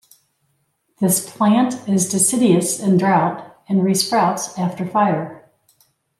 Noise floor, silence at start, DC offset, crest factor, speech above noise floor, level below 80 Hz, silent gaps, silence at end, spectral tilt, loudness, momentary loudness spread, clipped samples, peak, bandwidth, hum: -67 dBFS; 1 s; under 0.1%; 16 dB; 50 dB; -66 dBFS; none; 0.8 s; -4.5 dB/octave; -17 LUFS; 8 LU; under 0.1%; -4 dBFS; 16 kHz; none